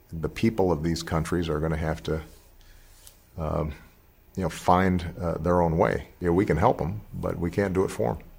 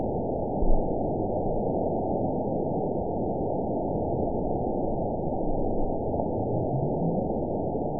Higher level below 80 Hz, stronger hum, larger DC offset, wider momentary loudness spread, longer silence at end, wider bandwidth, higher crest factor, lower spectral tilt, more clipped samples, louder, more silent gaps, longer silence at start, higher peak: second, -42 dBFS vs -34 dBFS; neither; second, under 0.1% vs 1%; first, 11 LU vs 2 LU; about the same, 0 s vs 0 s; first, 16.5 kHz vs 1 kHz; about the same, 20 dB vs 16 dB; second, -7 dB/octave vs -17 dB/octave; neither; first, -26 LUFS vs -29 LUFS; neither; about the same, 0.1 s vs 0 s; first, -6 dBFS vs -10 dBFS